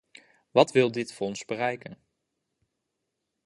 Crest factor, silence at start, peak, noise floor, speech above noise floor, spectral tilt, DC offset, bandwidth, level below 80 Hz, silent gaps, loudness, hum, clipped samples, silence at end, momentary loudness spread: 24 dB; 0.55 s; -4 dBFS; -82 dBFS; 56 dB; -5 dB/octave; under 0.1%; 11.5 kHz; -72 dBFS; none; -26 LUFS; none; under 0.1%; 1.5 s; 14 LU